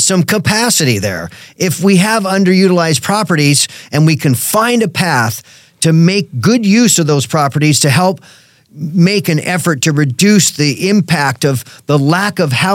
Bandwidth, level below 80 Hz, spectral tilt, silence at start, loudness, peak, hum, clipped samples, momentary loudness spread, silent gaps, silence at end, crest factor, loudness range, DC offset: 17 kHz; -54 dBFS; -4.5 dB/octave; 0 s; -11 LUFS; 0 dBFS; none; under 0.1%; 7 LU; none; 0 s; 12 dB; 1 LU; under 0.1%